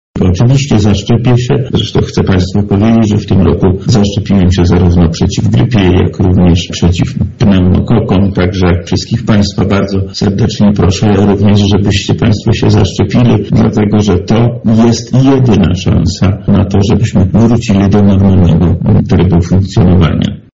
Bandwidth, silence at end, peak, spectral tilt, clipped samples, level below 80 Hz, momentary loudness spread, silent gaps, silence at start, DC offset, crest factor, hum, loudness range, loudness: 7.8 kHz; 0.15 s; 0 dBFS; -7 dB/octave; under 0.1%; -26 dBFS; 4 LU; none; 0.15 s; under 0.1%; 8 dB; none; 2 LU; -9 LUFS